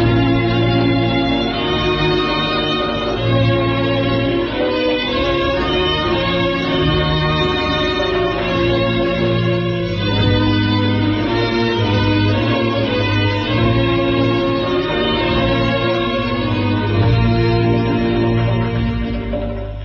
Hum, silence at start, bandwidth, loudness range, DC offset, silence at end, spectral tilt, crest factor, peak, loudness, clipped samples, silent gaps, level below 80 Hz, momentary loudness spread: none; 0 s; 6.6 kHz; 1 LU; under 0.1%; 0 s; -4.5 dB/octave; 12 dB; -4 dBFS; -16 LUFS; under 0.1%; none; -30 dBFS; 3 LU